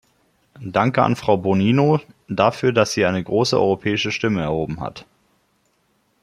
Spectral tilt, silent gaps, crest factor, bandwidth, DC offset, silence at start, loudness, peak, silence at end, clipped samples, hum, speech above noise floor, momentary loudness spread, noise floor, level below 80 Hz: -6 dB/octave; none; 18 dB; 14 kHz; under 0.1%; 0.6 s; -19 LUFS; -2 dBFS; 1.2 s; under 0.1%; none; 46 dB; 9 LU; -65 dBFS; -52 dBFS